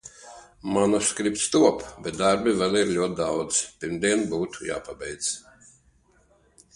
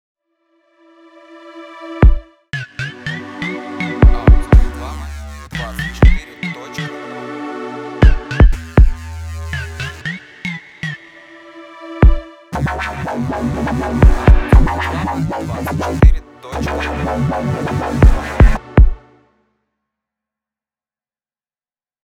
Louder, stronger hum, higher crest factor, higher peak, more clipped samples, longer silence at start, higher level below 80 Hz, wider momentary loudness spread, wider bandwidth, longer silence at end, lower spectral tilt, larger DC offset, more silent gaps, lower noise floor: second, -24 LUFS vs -17 LUFS; neither; first, 22 dB vs 14 dB; second, -4 dBFS vs 0 dBFS; second, under 0.1% vs 0.1%; second, 0.05 s vs 1.3 s; second, -56 dBFS vs -16 dBFS; second, 13 LU vs 16 LU; about the same, 11.5 kHz vs 10.5 kHz; second, 1.35 s vs 3.1 s; second, -3.5 dB/octave vs -7.5 dB/octave; neither; neither; second, -61 dBFS vs under -90 dBFS